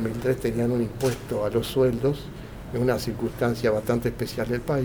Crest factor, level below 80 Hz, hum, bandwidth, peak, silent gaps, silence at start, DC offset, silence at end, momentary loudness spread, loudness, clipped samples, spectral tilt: 16 dB; -44 dBFS; none; over 20 kHz; -8 dBFS; none; 0 s; under 0.1%; 0 s; 7 LU; -26 LUFS; under 0.1%; -6.5 dB/octave